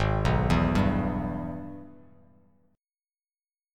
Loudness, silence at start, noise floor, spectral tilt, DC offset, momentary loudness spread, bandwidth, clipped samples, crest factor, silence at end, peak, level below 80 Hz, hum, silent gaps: -27 LUFS; 0 s; under -90 dBFS; -7.5 dB/octave; under 0.1%; 17 LU; 12.5 kHz; under 0.1%; 18 dB; 1.8 s; -10 dBFS; -38 dBFS; none; none